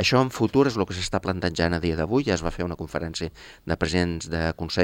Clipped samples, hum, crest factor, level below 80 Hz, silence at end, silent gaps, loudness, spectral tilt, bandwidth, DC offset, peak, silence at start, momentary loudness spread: under 0.1%; none; 18 dB; -44 dBFS; 0 s; none; -25 LUFS; -5.5 dB/octave; 16.5 kHz; under 0.1%; -6 dBFS; 0 s; 10 LU